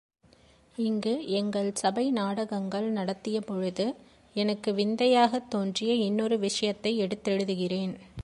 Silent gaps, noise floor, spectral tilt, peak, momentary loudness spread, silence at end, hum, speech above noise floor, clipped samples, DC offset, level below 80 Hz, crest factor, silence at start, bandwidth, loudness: none; -60 dBFS; -5 dB/octave; -10 dBFS; 7 LU; 0 s; none; 32 dB; under 0.1%; under 0.1%; -62 dBFS; 20 dB; 0.8 s; 11.5 kHz; -29 LUFS